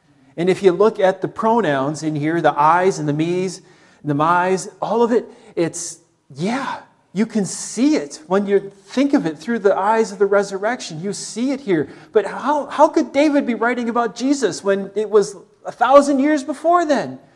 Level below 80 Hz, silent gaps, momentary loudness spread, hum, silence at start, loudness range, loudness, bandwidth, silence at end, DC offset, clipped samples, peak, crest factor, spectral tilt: -66 dBFS; none; 11 LU; none; 0.35 s; 4 LU; -18 LUFS; 12 kHz; 0.2 s; under 0.1%; under 0.1%; 0 dBFS; 18 dB; -5.5 dB/octave